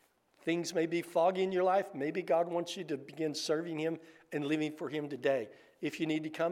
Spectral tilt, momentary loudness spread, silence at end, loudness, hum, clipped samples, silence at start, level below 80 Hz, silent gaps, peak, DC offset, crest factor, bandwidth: -5 dB/octave; 10 LU; 0 s; -34 LUFS; none; under 0.1%; 0.45 s; -86 dBFS; none; -18 dBFS; under 0.1%; 16 dB; 15.5 kHz